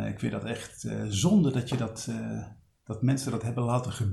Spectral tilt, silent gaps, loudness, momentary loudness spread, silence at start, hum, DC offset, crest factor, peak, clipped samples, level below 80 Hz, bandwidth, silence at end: -6 dB/octave; none; -29 LUFS; 13 LU; 0 s; none; under 0.1%; 18 dB; -12 dBFS; under 0.1%; -56 dBFS; 13 kHz; 0 s